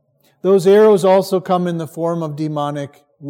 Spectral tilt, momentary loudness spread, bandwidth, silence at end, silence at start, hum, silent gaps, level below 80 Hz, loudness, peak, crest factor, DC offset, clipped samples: -7 dB/octave; 13 LU; 16 kHz; 0 s; 0.45 s; none; none; -72 dBFS; -15 LUFS; -2 dBFS; 14 dB; under 0.1%; under 0.1%